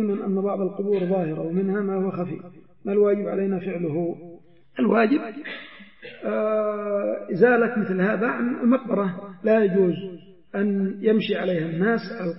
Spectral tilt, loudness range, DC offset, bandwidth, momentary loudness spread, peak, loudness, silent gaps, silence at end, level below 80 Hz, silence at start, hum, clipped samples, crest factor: -11.5 dB/octave; 4 LU; 0.2%; 5.8 kHz; 13 LU; -4 dBFS; -23 LUFS; none; 0 s; -70 dBFS; 0 s; none; under 0.1%; 18 dB